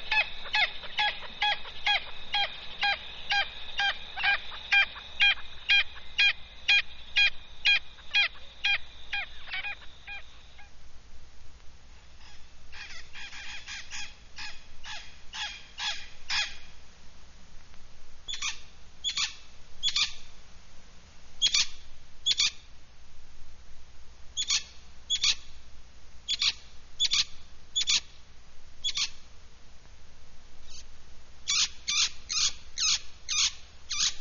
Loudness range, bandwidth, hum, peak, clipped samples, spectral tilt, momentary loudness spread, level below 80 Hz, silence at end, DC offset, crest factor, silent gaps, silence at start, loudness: 17 LU; 7.2 kHz; none; -12 dBFS; under 0.1%; 3.5 dB/octave; 18 LU; -48 dBFS; 0 s; under 0.1%; 20 dB; none; 0 s; -28 LUFS